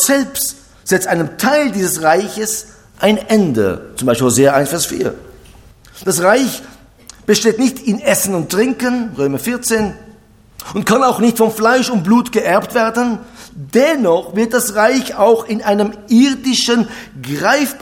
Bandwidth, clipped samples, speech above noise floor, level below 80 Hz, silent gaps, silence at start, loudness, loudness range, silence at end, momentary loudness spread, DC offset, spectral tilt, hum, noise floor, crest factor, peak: 18 kHz; under 0.1%; 30 dB; -48 dBFS; none; 0 s; -14 LUFS; 3 LU; 0 s; 9 LU; under 0.1%; -4 dB/octave; none; -44 dBFS; 14 dB; 0 dBFS